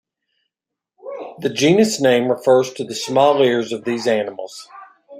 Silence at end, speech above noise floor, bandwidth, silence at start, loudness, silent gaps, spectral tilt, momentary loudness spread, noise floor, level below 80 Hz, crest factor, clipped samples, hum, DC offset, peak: 0 s; 68 dB; 15.5 kHz; 1.05 s; -17 LUFS; none; -4.5 dB/octave; 18 LU; -84 dBFS; -64 dBFS; 18 dB; under 0.1%; none; under 0.1%; 0 dBFS